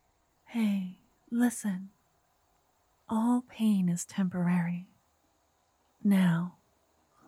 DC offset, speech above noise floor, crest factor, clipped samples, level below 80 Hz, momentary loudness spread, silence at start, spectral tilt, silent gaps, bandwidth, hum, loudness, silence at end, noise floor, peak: under 0.1%; 43 dB; 16 dB; under 0.1%; -76 dBFS; 14 LU; 0.5 s; -6.5 dB/octave; none; 14.5 kHz; none; -30 LUFS; 0.75 s; -72 dBFS; -16 dBFS